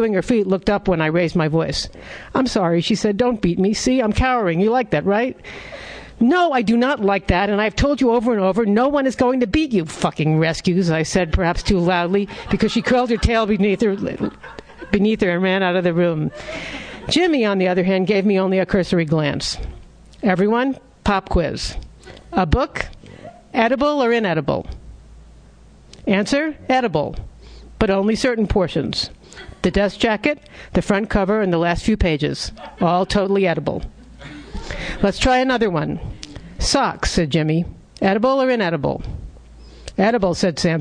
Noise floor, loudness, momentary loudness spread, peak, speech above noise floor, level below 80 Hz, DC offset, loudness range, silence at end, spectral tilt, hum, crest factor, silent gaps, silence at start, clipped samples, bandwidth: -45 dBFS; -19 LUFS; 13 LU; 0 dBFS; 27 dB; -34 dBFS; under 0.1%; 3 LU; 0 s; -5.5 dB/octave; none; 18 dB; none; 0 s; under 0.1%; 10.5 kHz